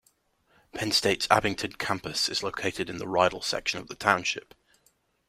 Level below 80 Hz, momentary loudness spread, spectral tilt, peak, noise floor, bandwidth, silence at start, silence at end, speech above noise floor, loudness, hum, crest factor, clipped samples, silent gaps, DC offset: -58 dBFS; 8 LU; -3 dB/octave; -2 dBFS; -68 dBFS; 16 kHz; 0.75 s; 0.9 s; 41 dB; -27 LUFS; none; 26 dB; under 0.1%; none; under 0.1%